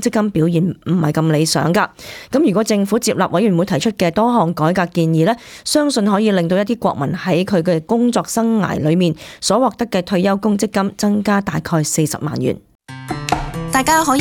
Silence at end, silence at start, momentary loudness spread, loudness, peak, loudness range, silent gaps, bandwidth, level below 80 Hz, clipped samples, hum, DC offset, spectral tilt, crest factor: 0 s; 0 s; 6 LU; -16 LUFS; -2 dBFS; 2 LU; 12.75-12.79 s; 18.5 kHz; -44 dBFS; under 0.1%; none; under 0.1%; -5.5 dB/octave; 14 dB